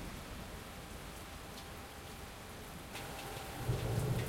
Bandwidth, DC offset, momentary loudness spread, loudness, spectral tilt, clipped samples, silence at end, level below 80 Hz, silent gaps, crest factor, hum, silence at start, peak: 16.5 kHz; under 0.1%; 11 LU; -44 LUFS; -5 dB/octave; under 0.1%; 0 s; -52 dBFS; none; 20 dB; none; 0 s; -22 dBFS